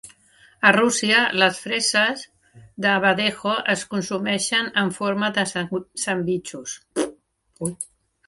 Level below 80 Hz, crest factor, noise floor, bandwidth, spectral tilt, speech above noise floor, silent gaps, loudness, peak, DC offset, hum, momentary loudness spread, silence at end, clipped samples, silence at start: -64 dBFS; 22 dB; -56 dBFS; 11.5 kHz; -3 dB/octave; 34 dB; none; -21 LUFS; 0 dBFS; under 0.1%; none; 13 LU; 0.45 s; under 0.1%; 0.05 s